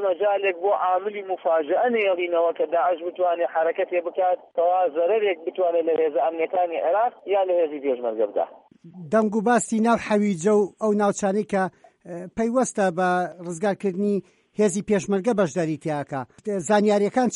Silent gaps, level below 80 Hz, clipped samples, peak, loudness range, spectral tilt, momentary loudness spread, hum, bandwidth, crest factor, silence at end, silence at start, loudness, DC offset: none; -66 dBFS; under 0.1%; -8 dBFS; 2 LU; -5.5 dB/octave; 7 LU; none; 11.5 kHz; 14 dB; 0 s; 0 s; -23 LUFS; under 0.1%